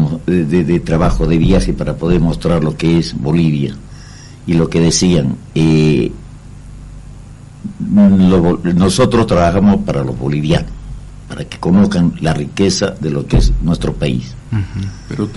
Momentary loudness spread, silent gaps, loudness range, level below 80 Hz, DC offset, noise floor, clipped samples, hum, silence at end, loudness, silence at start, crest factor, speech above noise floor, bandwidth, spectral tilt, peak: 18 LU; none; 3 LU; -26 dBFS; under 0.1%; -34 dBFS; under 0.1%; none; 0 s; -14 LUFS; 0 s; 12 dB; 21 dB; 11.5 kHz; -6.5 dB/octave; -2 dBFS